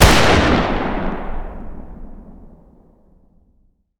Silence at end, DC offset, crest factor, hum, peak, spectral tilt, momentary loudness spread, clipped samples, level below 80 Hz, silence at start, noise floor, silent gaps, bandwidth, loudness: 1.55 s; under 0.1%; 18 dB; none; 0 dBFS; -4.5 dB/octave; 27 LU; under 0.1%; -26 dBFS; 0 s; -58 dBFS; none; over 20 kHz; -16 LUFS